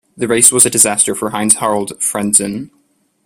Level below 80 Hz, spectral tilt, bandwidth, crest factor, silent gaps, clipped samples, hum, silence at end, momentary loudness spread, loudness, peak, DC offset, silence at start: -54 dBFS; -2.5 dB/octave; over 20 kHz; 14 dB; none; 0.4%; none; 0.6 s; 10 LU; -11 LUFS; 0 dBFS; under 0.1%; 0.2 s